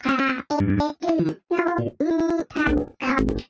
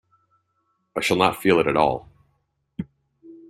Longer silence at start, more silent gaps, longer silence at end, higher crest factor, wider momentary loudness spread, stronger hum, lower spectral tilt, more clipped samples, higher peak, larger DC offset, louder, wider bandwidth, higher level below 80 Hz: second, 0.05 s vs 0.95 s; neither; about the same, 0.05 s vs 0.15 s; second, 14 dB vs 22 dB; second, 3 LU vs 18 LU; neither; first, -7 dB/octave vs -5 dB/octave; neither; second, -8 dBFS vs -2 dBFS; neither; about the same, -23 LUFS vs -21 LUFS; second, 8 kHz vs 15 kHz; first, -38 dBFS vs -56 dBFS